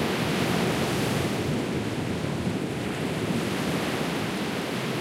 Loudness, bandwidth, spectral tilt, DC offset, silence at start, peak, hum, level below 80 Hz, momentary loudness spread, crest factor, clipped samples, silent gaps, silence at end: -27 LUFS; 16 kHz; -5 dB/octave; under 0.1%; 0 s; -12 dBFS; none; -50 dBFS; 4 LU; 14 dB; under 0.1%; none; 0 s